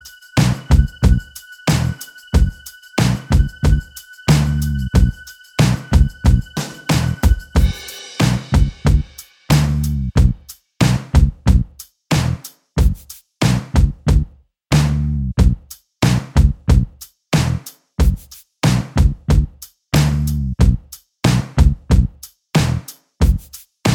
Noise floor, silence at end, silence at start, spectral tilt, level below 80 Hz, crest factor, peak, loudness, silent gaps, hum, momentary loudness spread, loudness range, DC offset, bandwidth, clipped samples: -33 dBFS; 0 s; 0.05 s; -6 dB/octave; -20 dBFS; 16 dB; 0 dBFS; -18 LUFS; none; none; 11 LU; 1 LU; under 0.1%; 18 kHz; under 0.1%